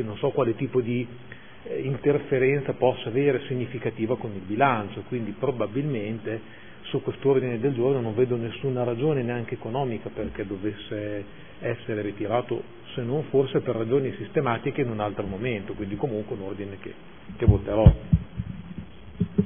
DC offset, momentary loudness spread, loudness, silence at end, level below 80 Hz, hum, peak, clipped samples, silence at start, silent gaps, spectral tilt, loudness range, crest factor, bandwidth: 0.5%; 13 LU; -27 LUFS; 0 s; -38 dBFS; none; -2 dBFS; under 0.1%; 0 s; none; -11.5 dB/octave; 4 LU; 24 dB; 3.6 kHz